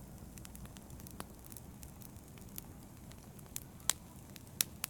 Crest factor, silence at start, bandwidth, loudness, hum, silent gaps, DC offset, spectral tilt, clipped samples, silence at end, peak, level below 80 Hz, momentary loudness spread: 42 dB; 0 s; over 20 kHz; -45 LUFS; none; none; under 0.1%; -2 dB/octave; under 0.1%; 0 s; -4 dBFS; -60 dBFS; 16 LU